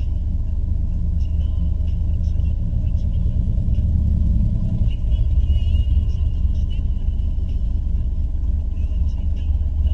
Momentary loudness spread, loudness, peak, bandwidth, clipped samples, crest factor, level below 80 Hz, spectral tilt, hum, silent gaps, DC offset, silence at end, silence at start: 5 LU; -22 LUFS; -6 dBFS; 3.5 kHz; under 0.1%; 12 dB; -20 dBFS; -9.5 dB/octave; none; none; under 0.1%; 0 s; 0 s